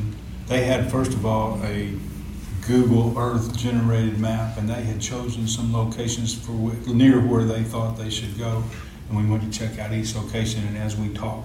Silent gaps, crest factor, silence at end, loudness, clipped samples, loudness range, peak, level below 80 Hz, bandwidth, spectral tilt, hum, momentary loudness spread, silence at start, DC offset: none; 18 dB; 0 s; -23 LUFS; under 0.1%; 4 LU; -6 dBFS; -38 dBFS; 15.5 kHz; -6 dB/octave; none; 10 LU; 0 s; under 0.1%